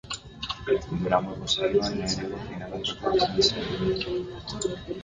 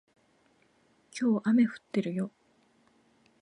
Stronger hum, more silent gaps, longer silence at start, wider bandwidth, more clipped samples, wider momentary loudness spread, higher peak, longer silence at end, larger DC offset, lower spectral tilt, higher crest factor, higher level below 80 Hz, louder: neither; neither; second, 0.05 s vs 1.15 s; about the same, 9.6 kHz vs 10 kHz; neither; about the same, 11 LU vs 12 LU; first, -8 dBFS vs -16 dBFS; second, 0 s vs 1.15 s; neither; second, -4.5 dB/octave vs -7 dB/octave; about the same, 20 dB vs 16 dB; first, -48 dBFS vs -82 dBFS; about the same, -27 LUFS vs -29 LUFS